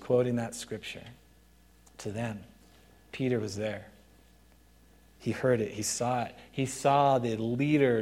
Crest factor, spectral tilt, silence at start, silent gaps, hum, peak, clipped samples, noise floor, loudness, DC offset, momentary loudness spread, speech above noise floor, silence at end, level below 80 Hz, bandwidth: 20 dB; -5.5 dB/octave; 0 s; none; none; -12 dBFS; under 0.1%; -60 dBFS; -30 LUFS; under 0.1%; 16 LU; 31 dB; 0 s; -62 dBFS; 16.5 kHz